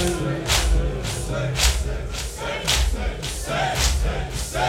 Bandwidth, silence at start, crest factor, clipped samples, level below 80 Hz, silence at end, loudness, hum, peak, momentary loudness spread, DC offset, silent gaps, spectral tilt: 16.5 kHz; 0 s; 18 dB; under 0.1%; -26 dBFS; 0 s; -23 LUFS; none; -4 dBFS; 8 LU; under 0.1%; none; -3.5 dB/octave